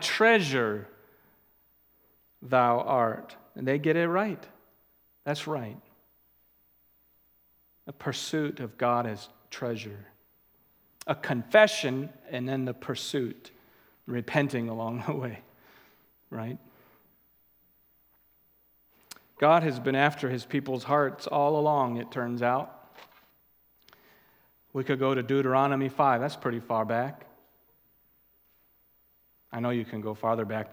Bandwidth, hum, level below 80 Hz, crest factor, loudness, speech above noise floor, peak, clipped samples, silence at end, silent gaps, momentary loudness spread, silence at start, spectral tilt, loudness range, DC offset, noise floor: 17 kHz; none; -76 dBFS; 26 dB; -28 LUFS; 38 dB; -4 dBFS; under 0.1%; 0 s; none; 18 LU; 0 s; -5.5 dB/octave; 11 LU; under 0.1%; -66 dBFS